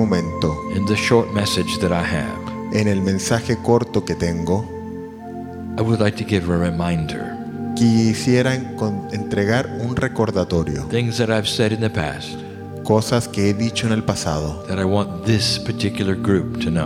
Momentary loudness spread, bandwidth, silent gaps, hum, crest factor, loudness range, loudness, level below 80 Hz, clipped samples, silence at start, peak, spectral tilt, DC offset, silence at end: 11 LU; 15.5 kHz; none; none; 18 dB; 2 LU; -20 LUFS; -42 dBFS; under 0.1%; 0 s; -2 dBFS; -5.5 dB/octave; under 0.1%; 0 s